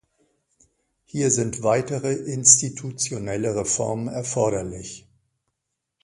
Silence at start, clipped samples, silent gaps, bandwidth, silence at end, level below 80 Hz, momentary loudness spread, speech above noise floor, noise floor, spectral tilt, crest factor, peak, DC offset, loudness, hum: 1.15 s; under 0.1%; none; 11.5 kHz; 1.05 s; -54 dBFS; 19 LU; 58 dB; -81 dBFS; -3.5 dB/octave; 24 dB; 0 dBFS; under 0.1%; -21 LUFS; none